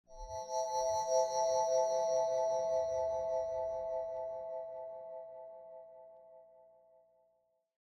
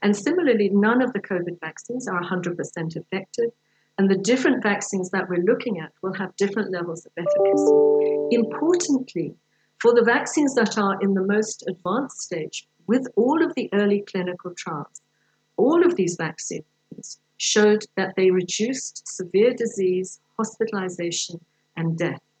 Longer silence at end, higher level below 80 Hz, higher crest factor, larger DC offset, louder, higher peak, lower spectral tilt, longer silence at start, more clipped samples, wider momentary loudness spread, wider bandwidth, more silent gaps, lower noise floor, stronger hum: first, 1.35 s vs 0.2 s; first, -66 dBFS vs -82 dBFS; about the same, 16 dB vs 16 dB; neither; second, -35 LUFS vs -23 LUFS; second, -20 dBFS vs -6 dBFS; second, -2 dB/octave vs -4.5 dB/octave; about the same, 0.1 s vs 0 s; neither; first, 19 LU vs 14 LU; first, 15.5 kHz vs 9.2 kHz; neither; first, -77 dBFS vs -68 dBFS; first, 60 Hz at -80 dBFS vs none